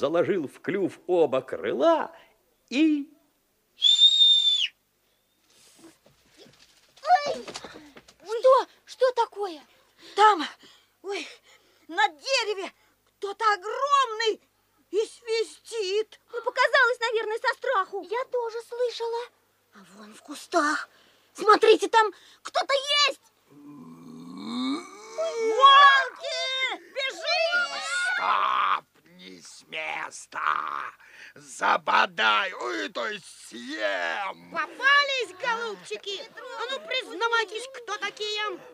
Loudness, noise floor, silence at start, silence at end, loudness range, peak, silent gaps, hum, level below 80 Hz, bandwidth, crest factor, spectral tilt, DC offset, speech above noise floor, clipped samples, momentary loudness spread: -24 LUFS; -69 dBFS; 0 s; 0.05 s; 9 LU; -4 dBFS; none; none; -80 dBFS; 15.5 kHz; 22 dB; -1.5 dB/octave; under 0.1%; 44 dB; under 0.1%; 17 LU